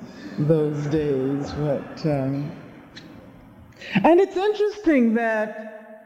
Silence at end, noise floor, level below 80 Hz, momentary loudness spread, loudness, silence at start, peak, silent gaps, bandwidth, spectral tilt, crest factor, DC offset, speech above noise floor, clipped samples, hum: 0.1 s; -46 dBFS; -54 dBFS; 22 LU; -22 LUFS; 0 s; -6 dBFS; none; 10.5 kHz; -8 dB/octave; 16 dB; under 0.1%; 25 dB; under 0.1%; none